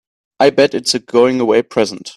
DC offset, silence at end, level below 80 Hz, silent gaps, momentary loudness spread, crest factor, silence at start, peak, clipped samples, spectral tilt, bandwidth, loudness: under 0.1%; 0.05 s; -58 dBFS; none; 6 LU; 14 dB; 0.4 s; 0 dBFS; under 0.1%; -4 dB/octave; 13 kHz; -14 LUFS